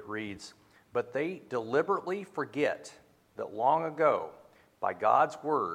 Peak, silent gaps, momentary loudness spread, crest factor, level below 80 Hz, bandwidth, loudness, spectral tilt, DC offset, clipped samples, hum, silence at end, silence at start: -12 dBFS; none; 16 LU; 20 dB; -76 dBFS; 15 kHz; -31 LUFS; -5.5 dB/octave; under 0.1%; under 0.1%; none; 0 s; 0 s